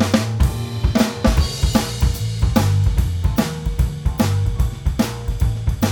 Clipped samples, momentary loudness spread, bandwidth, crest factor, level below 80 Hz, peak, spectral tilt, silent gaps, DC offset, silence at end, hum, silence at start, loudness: under 0.1%; 5 LU; 18 kHz; 18 dB; -22 dBFS; 0 dBFS; -6 dB/octave; none; under 0.1%; 0 s; none; 0 s; -20 LUFS